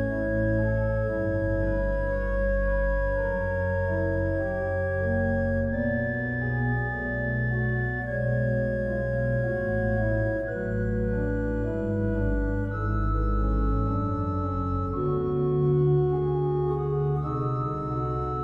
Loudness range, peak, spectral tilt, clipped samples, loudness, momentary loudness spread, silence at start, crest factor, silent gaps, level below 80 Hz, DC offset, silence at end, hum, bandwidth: 2 LU; -14 dBFS; -10.5 dB/octave; under 0.1%; -27 LUFS; 3 LU; 0 s; 12 dB; none; -34 dBFS; under 0.1%; 0 s; none; 5.2 kHz